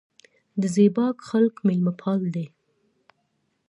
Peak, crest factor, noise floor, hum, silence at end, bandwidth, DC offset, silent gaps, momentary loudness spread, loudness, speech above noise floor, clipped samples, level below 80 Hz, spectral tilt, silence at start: -6 dBFS; 18 dB; -72 dBFS; none; 1.2 s; 11 kHz; under 0.1%; none; 13 LU; -23 LUFS; 50 dB; under 0.1%; -72 dBFS; -8 dB/octave; 0.55 s